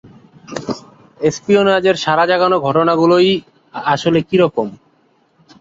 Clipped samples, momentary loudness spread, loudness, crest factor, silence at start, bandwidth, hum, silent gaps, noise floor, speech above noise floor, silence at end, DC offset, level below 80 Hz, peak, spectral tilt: under 0.1%; 15 LU; -14 LUFS; 14 dB; 0.5 s; 7.8 kHz; none; none; -57 dBFS; 43 dB; 0.85 s; under 0.1%; -54 dBFS; -2 dBFS; -5.5 dB/octave